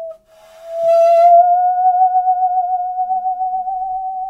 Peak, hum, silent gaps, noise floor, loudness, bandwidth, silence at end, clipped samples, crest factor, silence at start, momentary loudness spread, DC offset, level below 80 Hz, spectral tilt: -2 dBFS; none; none; -44 dBFS; -14 LUFS; 6.4 kHz; 0 s; under 0.1%; 12 dB; 0 s; 13 LU; under 0.1%; -58 dBFS; -3 dB/octave